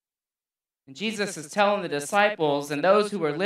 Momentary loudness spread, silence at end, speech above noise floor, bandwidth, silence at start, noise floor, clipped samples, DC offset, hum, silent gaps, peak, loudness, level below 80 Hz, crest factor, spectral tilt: 8 LU; 0 s; over 66 dB; 15 kHz; 0.9 s; under -90 dBFS; under 0.1%; under 0.1%; none; none; -6 dBFS; -24 LUFS; -80 dBFS; 20 dB; -4 dB/octave